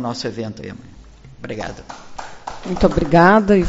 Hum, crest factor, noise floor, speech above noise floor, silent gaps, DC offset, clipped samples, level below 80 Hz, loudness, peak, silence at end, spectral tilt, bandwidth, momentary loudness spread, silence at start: none; 18 dB; -41 dBFS; 24 dB; none; under 0.1%; under 0.1%; -34 dBFS; -17 LUFS; 0 dBFS; 0 s; -5.5 dB/octave; 8 kHz; 24 LU; 0 s